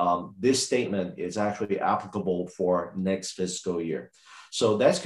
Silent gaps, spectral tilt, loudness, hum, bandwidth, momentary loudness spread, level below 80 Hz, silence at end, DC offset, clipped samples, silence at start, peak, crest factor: none; -4.5 dB/octave; -28 LUFS; none; 12.5 kHz; 8 LU; -66 dBFS; 0 s; under 0.1%; under 0.1%; 0 s; -8 dBFS; 18 dB